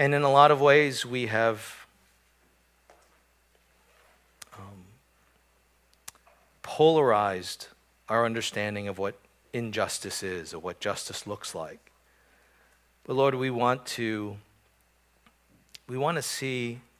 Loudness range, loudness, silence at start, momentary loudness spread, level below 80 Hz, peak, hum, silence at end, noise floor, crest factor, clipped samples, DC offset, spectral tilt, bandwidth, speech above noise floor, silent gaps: 7 LU; -26 LUFS; 0 s; 26 LU; -66 dBFS; -4 dBFS; none; 0.2 s; -66 dBFS; 26 dB; under 0.1%; under 0.1%; -4.5 dB/octave; 16 kHz; 40 dB; none